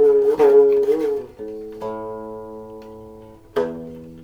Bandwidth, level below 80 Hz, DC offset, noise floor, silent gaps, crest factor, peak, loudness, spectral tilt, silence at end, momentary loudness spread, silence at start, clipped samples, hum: 6.6 kHz; -54 dBFS; under 0.1%; -42 dBFS; none; 16 dB; -4 dBFS; -18 LUFS; -7 dB/octave; 0 s; 23 LU; 0 s; under 0.1%; none